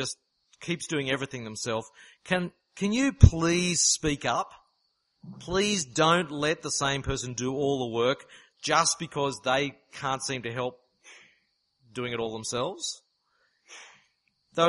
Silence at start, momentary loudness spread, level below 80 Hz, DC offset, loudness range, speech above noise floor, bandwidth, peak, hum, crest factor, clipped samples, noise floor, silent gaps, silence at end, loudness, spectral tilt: 0 s; 14 LU; -40 dBFS; under 0.1%; 10 LU; 47 dB; 11.5 kHz; 0 dBFS; none; 28 dB; under 0.1%; -75 dBFS; none; 0 s; -27 LUFS; -4 dB/octave